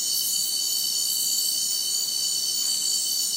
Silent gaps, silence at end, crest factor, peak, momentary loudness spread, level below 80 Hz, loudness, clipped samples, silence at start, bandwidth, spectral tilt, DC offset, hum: none; 0 s; 12 dB; -12 dBFS; 1 LU; -82 dBFS; -22 LUFS; under 0.1%; 0 s; 16 kHz; 2.5 dB/octave; under 0.1%; none